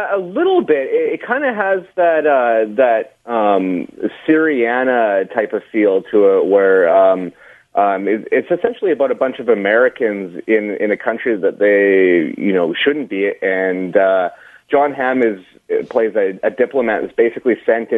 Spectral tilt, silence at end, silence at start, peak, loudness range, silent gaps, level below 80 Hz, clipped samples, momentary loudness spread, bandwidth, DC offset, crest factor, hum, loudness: -7.5 dB/octave; 0 s; 0 s; 0 dBFS; 3 LU; none; -64 dBFS; under 0.1%; 7 LU; 3.9 kHz; under 0.1%; 14 dB; none; -15 LUFS